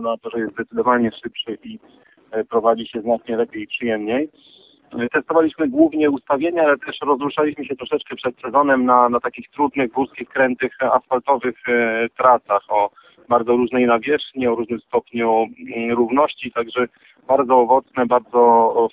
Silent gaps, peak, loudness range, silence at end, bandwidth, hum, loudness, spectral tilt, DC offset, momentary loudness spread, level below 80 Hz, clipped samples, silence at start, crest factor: none; -2 dBFS; 4 LU; 0.05 s; 4 kHz; none; -19 LUFS; -9 dB/octave; under 0.1%; 11 LU; -60 dBFS; under 0.1%; 0 s; 18 dB